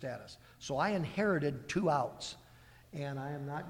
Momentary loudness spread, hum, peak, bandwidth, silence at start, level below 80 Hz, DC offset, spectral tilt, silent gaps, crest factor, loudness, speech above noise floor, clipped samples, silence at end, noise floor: 16 LU; none; -18 dBFS; 16.5 kHz; 0 s; -64 dBFS; under 0.1%; -6 dB/octave; none; 18 dB; -35 LUFS; 23 dB; under 0.1%; 0 s; -58 dBFS